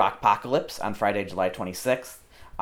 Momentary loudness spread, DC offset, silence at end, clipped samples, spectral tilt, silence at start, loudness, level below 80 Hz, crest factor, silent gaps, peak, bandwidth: 10 LU; under 0.1%; 0 s; under 0.1%; -4.5 dB/octave; 0 s; -26 LUFS; -54 dBFS; 20 dB; none; -6 dBFS; 17.5 kHz